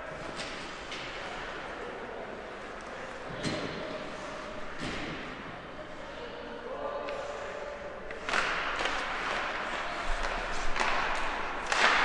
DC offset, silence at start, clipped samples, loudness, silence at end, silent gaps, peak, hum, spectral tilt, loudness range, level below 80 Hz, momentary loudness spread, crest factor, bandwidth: under 0.1%; 0 s; under 0.1%; -35 LUFS; 0 s; none; -10 dBFS; none; -3 dB/octave; 8 LU; -46 dBFS; 11 LU; 24 dB; 11 kHz